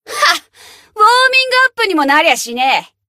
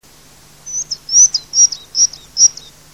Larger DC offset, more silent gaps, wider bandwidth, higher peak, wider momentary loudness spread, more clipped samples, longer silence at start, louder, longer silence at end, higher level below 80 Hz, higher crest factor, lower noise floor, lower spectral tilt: second, under 0.1% vs 0.3%; neither; about the same, 16 kHz vs 16 kHz; about the same, 0 dBFS vs 0 dBFS; second, 5 LU vs 13 LU; neither; second, 0.1 s vs 0.65 s; about the same, -11 LUFS vs -11 LUFS; second, 0.25 s vs 0.4 s; second, -64 dBFS vs -54 dBFS; about the same, 14 dB vs 16 dB; about the same, -42 dBFS vs -44 dBFS; first, 0 dB/octave vs 3 dB/octave